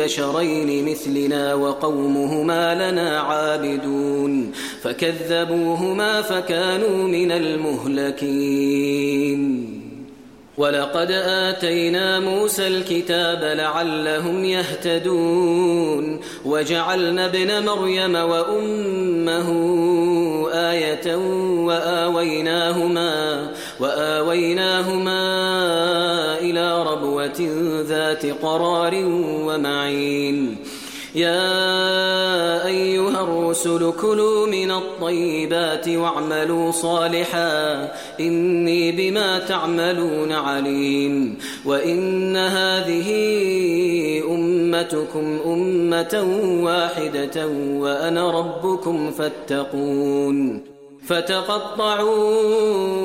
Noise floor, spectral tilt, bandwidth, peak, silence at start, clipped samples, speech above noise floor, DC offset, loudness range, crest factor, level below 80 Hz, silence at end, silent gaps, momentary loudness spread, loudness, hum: -43 dBFS; -4.5 dB/octave; 16.5 kHz; -6 dBFS; 0 s; under 0.1%; 23 dB; 0.1%; 2 LU; 14 dB; -62 dBFS; 0 s; none; 5 LU; -20 LUFS; none